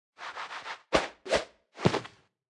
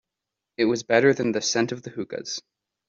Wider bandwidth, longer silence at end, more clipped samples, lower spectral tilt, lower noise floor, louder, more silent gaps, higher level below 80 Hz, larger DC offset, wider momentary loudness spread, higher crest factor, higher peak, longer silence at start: first, 12 kHz vs 7.6 kHz; about the same, 0.4 s vs 0.5 s; neither; about the same, -4.5 dB/octave vs -4 dB/octave; second, -50 dBFS vs -86 dBFS; second, -32 LUFS vs -24 LUFS; neither; first, -56 dBFS vs -66 dBFS; neither; about the same, 13 LU vs 14 LU; first, 26 dB vs 20 dB; second, -8 dBFS vs -4 dBFS; second, 0.2 s vs 0.6 s